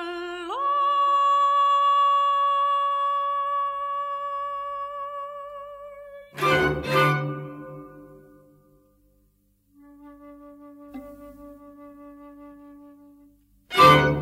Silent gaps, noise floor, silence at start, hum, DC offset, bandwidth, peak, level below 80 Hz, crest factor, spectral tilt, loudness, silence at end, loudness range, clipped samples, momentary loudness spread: none; -65 dBFS; 0 s; 50 Hz at -55 dBFS; under 0.1%; 16 kHz; -4 dBFS; -52 dBFS; 22 dB; -5.5 dB/octave; -22 LUFS; 0 s; 24 LU; under 0.1%; 22 LU